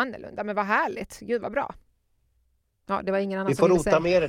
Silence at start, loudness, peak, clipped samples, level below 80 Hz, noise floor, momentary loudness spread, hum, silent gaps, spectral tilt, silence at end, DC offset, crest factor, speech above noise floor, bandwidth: 0 s; -25 LUFS; -6 dBFS; under 0.1%; -52 dBFS; -69 dBFS; 11 LU; none; none; -6 dB/octave; 0 s; under 0.1%; 20 dB; 45 dB; 15.5 kHz